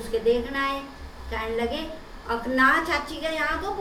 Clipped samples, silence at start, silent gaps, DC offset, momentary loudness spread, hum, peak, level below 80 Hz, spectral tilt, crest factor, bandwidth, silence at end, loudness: under 0.1%; 0 s; none; under 0.1%; 17 LU; none; -6 dBFS; -42 dBFS; -4.5 dB/octave; 20 dB; 16 kHz; 0 s; -25 LUFS